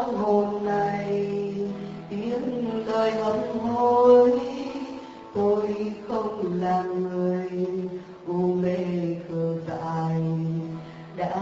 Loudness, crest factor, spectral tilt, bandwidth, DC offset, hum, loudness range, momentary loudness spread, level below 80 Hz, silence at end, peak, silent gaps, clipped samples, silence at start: -25 LUFS; 18 dB; -7 dB/octave; 7.8 kHz; under 0.1%; none; 5 LU; 11 LU; -60 dBFS; 0 s; -6 dBFS; none; under 0.1%; 0 s